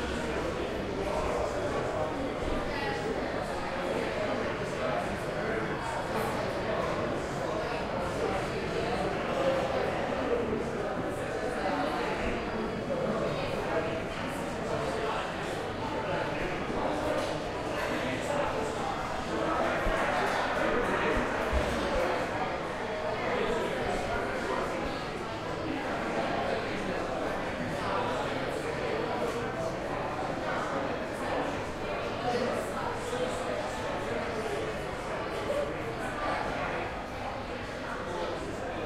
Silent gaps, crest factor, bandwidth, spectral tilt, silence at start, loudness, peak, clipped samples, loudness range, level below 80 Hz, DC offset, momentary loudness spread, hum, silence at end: none; 16 dB; 16 kHz; -5 dB/octave; 0 s; -32 LUFS; -16 dBFS; under 0.1%; 3 LU; -46 dBFS; under 0.1%; 5 LU; none; 0 s